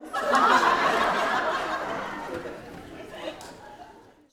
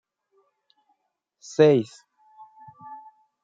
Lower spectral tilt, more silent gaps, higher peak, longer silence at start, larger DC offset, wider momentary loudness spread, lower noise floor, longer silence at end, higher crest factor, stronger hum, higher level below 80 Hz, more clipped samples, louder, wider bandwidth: second, -3 dB/octave vs -6.5 dB/octave; neither; about the same, -6 dBFS vs -4 dBFS; second, 0 s vs 1.6 s; neither; second, 22 LU vs 27 LU; second, -50 dBFS vs -75 dBFS; second, 0.3 s vs 0.5 s; about the same, 20 dB vs 22 dB; neither; first, -58 dBFS vs -74 dBFS; neither; second, -24 LUFS vs -20 LUFS; first, 17.5 kHz vs 7.8 kHz